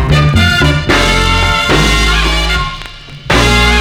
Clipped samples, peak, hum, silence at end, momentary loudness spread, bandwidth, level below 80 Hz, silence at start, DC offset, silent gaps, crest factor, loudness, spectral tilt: 0.3%; 0 dBFS; none; 0 s; 10 LU; 17 kHz; -16 dBFS; 0 s; under 0.1%; none; 10 dB; -10 LUFS; -4 dB/octave